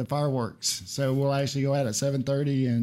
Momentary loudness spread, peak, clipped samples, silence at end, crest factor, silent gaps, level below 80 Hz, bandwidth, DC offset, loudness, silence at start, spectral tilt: 3 LU; -14 dBFS; under 0.1%; 0 s; 12 dB; none; -62 dBFS; 14.5 kHz; under 0.1%; -27 LUFS; 0 s; -5.5 dB/octave